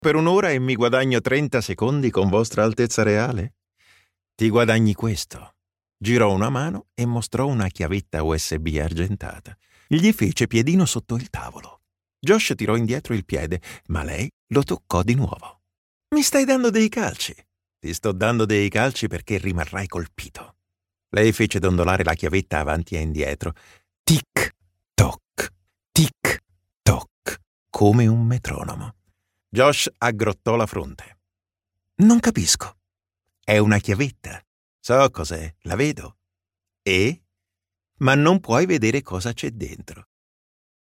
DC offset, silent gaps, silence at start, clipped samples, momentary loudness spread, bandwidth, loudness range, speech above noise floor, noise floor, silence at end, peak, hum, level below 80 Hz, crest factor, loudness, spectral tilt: under 0.1%; 14.33-14.47 s, 15.78-16.01 s, 23.99-24.04 s, 27.11-27.22 s, 27.47-27.66 s, 34.47-34.79 s; 0 s; under 0.1%; 14 LU; 16.5 kHz; 3 LU; 67 dB; -87 dBFS; 0.95 s; -2 dBFS; none; -42 dBFS; 20 dB; -21 LUFS; -5 dB/octave